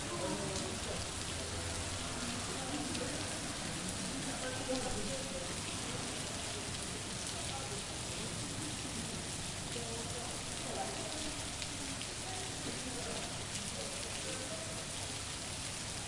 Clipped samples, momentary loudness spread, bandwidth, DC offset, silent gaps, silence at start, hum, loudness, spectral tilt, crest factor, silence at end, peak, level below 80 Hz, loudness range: under 0.1%; 2 LU; 11.5 kHz; under 0.1%; none; 0 s; none; -39 LUFS; -2.5 dB/octave; 22 dB; 0 s; -18 dBFS; -54 dBFS; 1 LU